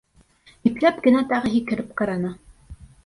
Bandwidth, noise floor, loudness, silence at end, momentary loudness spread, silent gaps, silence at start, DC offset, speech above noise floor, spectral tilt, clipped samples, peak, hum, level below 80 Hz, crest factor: 11 kHz; -55 dBFS; -22 LUFS; 0.2 s; 9 LU; none; 0.65 s; under 0.1%; 34 dB; -7 dB/octave; under 0.1%; -4 dBFS; none; -50 dBFS; 18 dB